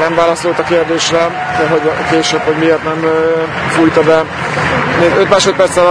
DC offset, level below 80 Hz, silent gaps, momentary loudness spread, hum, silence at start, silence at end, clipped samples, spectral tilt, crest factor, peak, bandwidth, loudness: under 0.1%; -40 dBFS; none; 5 LU; none; 0 s; 0 s; 0.3%; -4.5 dB/octave; 12 dB; 0 dBFS; 10.5 kHz; -11 LUFS